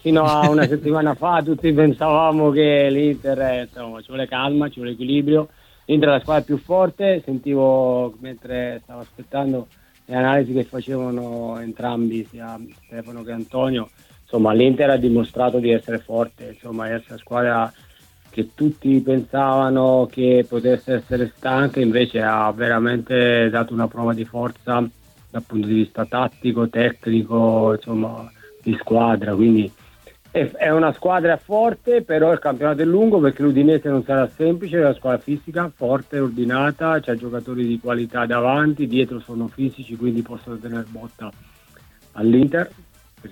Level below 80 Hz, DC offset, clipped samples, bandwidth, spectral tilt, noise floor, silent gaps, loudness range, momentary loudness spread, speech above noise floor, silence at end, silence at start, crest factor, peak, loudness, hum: -52 dBFS; under 0.1%; under 0.1%; 17 kHz; -8 dB/octave; -50 dBFS; none; 6 LU; 13 LU; 31 dB; 0 s; 0.05 s; 18 dB; -2 dBFS; -19 LUFS; none